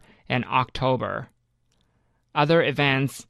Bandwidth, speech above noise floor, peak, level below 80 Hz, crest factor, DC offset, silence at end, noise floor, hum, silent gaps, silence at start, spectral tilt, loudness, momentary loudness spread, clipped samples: 13 kHz; 45 dB; -6 dBFS; -52 dBFS; 18 dB; under 0.1%; 0.05 s; -68 dBFS; none; none; 0.3 s; -6 dB/octave; -23 LUFS; 10 LU; under 0.1%